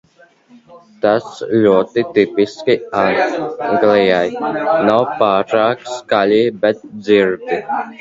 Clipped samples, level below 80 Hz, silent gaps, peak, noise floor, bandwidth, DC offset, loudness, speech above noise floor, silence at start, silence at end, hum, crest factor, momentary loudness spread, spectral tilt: under 0.1%; -56 dBFS; none; 0 dBFS; -48 dBFS; 7.8 kHz; under 0.1%; -15 LUFS; 34 dB; 0.7 s; 0.05 s; none; 16 dB; 7 LU; -6 dB/octave